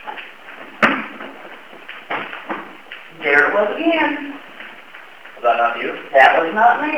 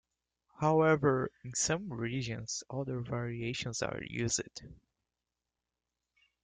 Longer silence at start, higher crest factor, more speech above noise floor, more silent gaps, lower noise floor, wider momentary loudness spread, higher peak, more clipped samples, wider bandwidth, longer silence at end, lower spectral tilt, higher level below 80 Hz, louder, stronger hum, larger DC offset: second, 0.05 s vs 0.6 s; about the same, 20 dB vs 20 dB; second, 25 dB vs 56 dB; neither; second, -40 dBFS vs -89 dBFS; first, 24 LU vs 11 LU; first, 0 dBFS vs -16 dBFS; neither; first, 13.5 kHz vs 10 kHz; second, 0 s vs 1.7 s; about the same, -4.5 dB/octave vs -4.5 dB/octave; second, -68 dBFS vs -62 dBFS; first, -16 LUFS vs -33 LUFS; neither; first, 0.5% vs under 0.1%